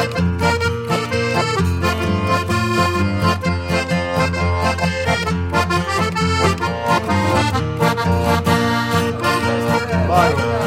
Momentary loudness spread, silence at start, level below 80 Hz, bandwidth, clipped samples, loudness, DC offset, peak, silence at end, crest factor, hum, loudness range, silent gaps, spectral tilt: 3 LU; 0 s; -34 dBFS; 16 kHz; under 0.1%; -18 LUFS; under 0.1%; -2 dBFS; 0 s; 16 dB; none; 1 LU; none; -5.5 dB/octave